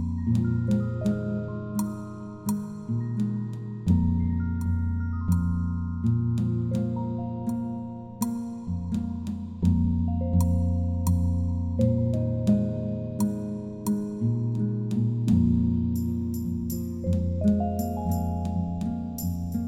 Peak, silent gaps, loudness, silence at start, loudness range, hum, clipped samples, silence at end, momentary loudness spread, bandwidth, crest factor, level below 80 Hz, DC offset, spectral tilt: -10 dBFS; none; -27 LUFS; 0 s; 4 LU; none; under 0.1%; 0 s; 8 LU; 16.5 kHz; 16 dB; -40 dBFS; under 0.1%; -9 dB/octave